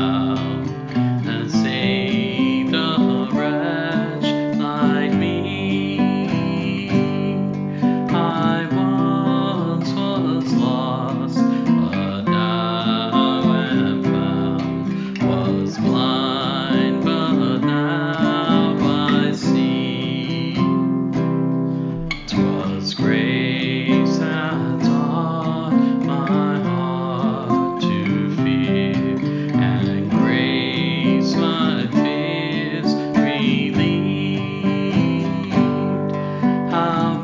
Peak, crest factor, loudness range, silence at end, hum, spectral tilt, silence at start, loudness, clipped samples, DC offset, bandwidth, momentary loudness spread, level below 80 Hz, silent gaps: -4 dBFS; 16 dB; 1 LU; 0 s; none; -7 dB/octave; 0 s; -19 LUFS; under 0.1%; under 0.1%; 7.6 kHz; 4 LU; -50 dBFS; none